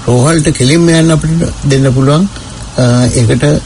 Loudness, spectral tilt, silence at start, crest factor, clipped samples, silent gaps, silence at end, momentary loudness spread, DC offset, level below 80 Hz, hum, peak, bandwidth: -9 LUFS; -5.5 dB/octave; 0 s; 8 dB; 0.2%; none; 0 s; 6 LU; under 0.1%; -28 dBFS; none; 0 dBFS; 11 kHz